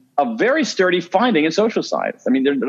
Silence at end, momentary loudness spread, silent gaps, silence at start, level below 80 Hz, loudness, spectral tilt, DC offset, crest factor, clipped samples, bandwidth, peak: 0 s; 5 LU; none; 0.15 s; -78 dBFS; -18 LUFS; -4.5 dB/octave; under 0.1%; 16 dB; under 0.1%; 7.8 kHz; -2 dBFS